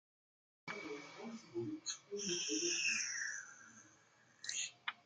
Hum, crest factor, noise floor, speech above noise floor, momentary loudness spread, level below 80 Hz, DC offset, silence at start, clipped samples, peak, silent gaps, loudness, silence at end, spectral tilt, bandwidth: none; 20 dB; -69 dBFS; 28 dB; 20 LU; -88 dBFS; under 0.1%; 0.65 s; under 0.1%; -24 dBFS; none; -41 LUFS; 0.1 s; -1 dB/octave; 11 kHz